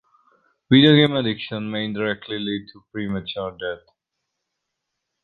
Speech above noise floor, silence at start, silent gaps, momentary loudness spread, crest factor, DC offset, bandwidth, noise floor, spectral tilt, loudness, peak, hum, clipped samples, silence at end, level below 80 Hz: 59 dB; 0.7 s; none; 17 LU; 20 dB; under 0.1%; 4.9 kHz; -80 dBFS; -8.5 dB/octave; -21 LUFS; -2 dBFS; none; under 0.1%; 1.5 s; -58 dBFS